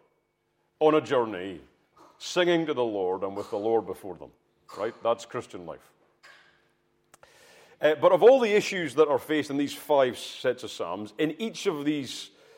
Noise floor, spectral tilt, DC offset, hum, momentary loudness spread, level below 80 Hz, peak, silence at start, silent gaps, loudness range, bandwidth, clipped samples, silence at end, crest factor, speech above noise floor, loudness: -73 dBFS; -4.5 dB/octave; under 0.1%; none; 18 LU; -74 dBFS; -6 dBFS; 0.8 s; none; 13 LU; 16.5 kHz; under 0.1%; 0.3 s; 22 dB; 48 dB; -26 LUFS